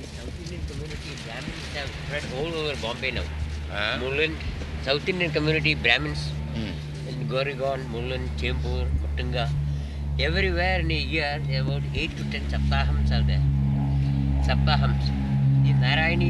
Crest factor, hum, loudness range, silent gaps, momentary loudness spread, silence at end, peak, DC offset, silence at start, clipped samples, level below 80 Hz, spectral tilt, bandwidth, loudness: 22 dB; none; 5 LU; none; 12 LU; 0 s; -4 dBFS; under 0.1%; 0 s; under 0.1%; -30 dBFS; -6.5 dB/octave; 11 kHz; -26 LUFS